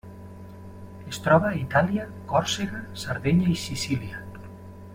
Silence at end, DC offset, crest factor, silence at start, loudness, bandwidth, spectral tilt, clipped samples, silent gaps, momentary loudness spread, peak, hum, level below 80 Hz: 0 s; under 0.1%; 20 dB; 0.05 s; -25 LUFS; 16 kHz; -5.5 dB/octave; under 0.1%; none; 22 LU; -6 dBFS; none; -52 dBFS